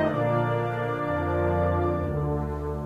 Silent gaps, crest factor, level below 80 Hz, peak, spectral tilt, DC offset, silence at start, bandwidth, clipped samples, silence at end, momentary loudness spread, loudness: none; 14 dB; -40 dBFS; -12 dBFS; -9 dB/octave; under 0.1%; 0 s; 7.6 kHz; under 0.1%; 0 s; 4 LU; -26 LUFS